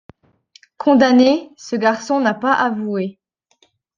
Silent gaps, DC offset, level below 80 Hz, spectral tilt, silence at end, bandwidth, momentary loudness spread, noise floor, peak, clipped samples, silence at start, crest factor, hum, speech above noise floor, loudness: none; under 0.1%; -64 dBFS; -5 dB/octave; 0.85 s; 7.4 kHz; 12 LU; -60 dBFS; -2 dBFS; under 0.1%; 0.8 s; 16 dB; none; 45 dB; -16 LUFS